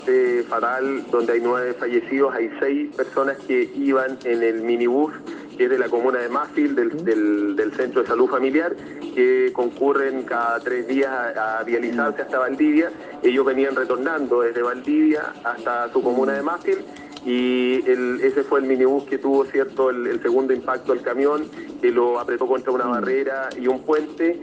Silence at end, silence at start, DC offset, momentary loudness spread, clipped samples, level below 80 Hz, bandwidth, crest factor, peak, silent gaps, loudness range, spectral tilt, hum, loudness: 0 s; 0 s; under 0.1%; 5 LU; under 0.1%; -66 dBFS; 8 kHz; 14 dB; -6 dBFS; none; 2 LU; -6 dB/octave; none; -21 LUFS